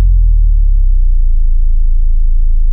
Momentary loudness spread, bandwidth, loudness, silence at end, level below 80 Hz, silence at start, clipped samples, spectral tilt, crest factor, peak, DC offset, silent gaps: 4 LU; 0.2 kHz; -15 LUFS; 0 s; -8 dBFS; 0 s; under 0.1%; -20 dB/octave; 4 dB; -2 dBFS; under 0.1%; none